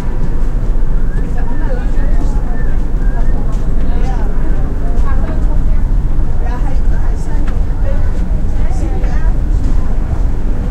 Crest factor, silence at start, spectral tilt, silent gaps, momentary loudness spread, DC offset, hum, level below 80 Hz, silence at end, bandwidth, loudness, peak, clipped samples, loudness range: 10 dB; 0 s; -8 dB/octave; none; 2 LU; under 0.1%; none; -10 dBFS; 0 s; 3 kHz; -18 LUFS; 0 dBFS; under 0.1%; 1 LU